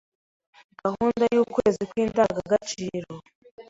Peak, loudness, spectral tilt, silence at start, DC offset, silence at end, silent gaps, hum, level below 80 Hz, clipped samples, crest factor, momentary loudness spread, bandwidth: -6 dBFS; -25 LUFS; -5.5 dB/octave; 0.85 s; under 0.1%; 0.05 s; 3.35-3.42 s, 3.51-3.58 s; none; -56 dBFS; under 0.1%; 18 dB; 12 LU; 8 kHz